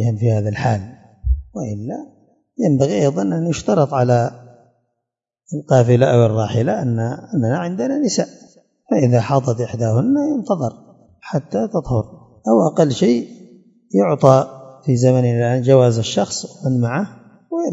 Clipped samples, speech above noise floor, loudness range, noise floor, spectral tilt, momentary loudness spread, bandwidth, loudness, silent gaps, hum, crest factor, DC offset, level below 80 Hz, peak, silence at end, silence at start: under 0.1%; 65 dB; 4 LU; -81 dBFS; -7 dB/octave; 14 LU; 7.8 kHz; -17 LUFS; none; none; 18 dB; under 0.1%; -36 dBFS; 0 dBFS; 0 s; 0 s